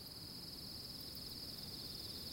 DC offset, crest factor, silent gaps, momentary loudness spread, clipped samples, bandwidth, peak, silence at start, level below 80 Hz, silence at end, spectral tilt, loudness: under 0.1%; 14 dB; none; 2 LU; under 0.1%; 16.5 kHz; -36 dBFS; 0 s; -66 dBFS; 0 s; -3 dB/octave; -47 LUFS